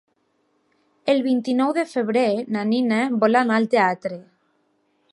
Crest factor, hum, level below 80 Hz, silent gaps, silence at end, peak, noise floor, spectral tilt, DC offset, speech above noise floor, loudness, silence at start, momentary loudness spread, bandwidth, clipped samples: 18 dB; none; -76 dBFS; none; 0.9 s; -4 dBFS; -67 dBFS; -6 dB/octave; under 0.1%; 47 dB; -21 LUFS; 1.05 s; 9 LU; 11 kHz; under 0.1%